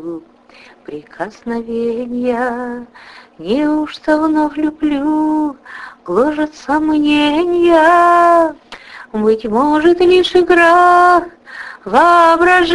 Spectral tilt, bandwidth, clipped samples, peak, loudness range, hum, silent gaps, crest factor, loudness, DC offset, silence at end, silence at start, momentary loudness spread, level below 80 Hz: -5 dB/octave; 11.5 kHz; under 0.1%; 0 dBFS; 9 LU; none; none; 14 dB; -12 LUFS; under 0.1%; 0 s; 0 s; 21 LU; -46 dBFS